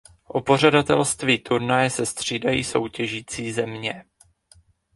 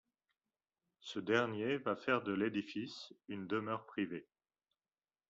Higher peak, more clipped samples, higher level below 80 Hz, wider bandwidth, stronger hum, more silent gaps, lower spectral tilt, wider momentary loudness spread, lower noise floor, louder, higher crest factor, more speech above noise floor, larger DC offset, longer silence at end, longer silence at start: first, 0 dBFS vs -18 dBFS; neither; first, -54 dBFS vs -82 dBFS; first, 11.5 kHz vs 7.6 kHz; neither; neither; about the same, -4 dB/octave vs -4 dB/octave; about the same, 12 LU vs 13 LU; second, -57 dBFS vs under -90 dBFS; first, -22 LUFS vs -39 LUFS; about the same, 22 dB vs 22 dB; second, 35 dB vs over 51 dB; neither; second, 0.95 s vs 1.1 s; second, 0.35 s vs 1.05 s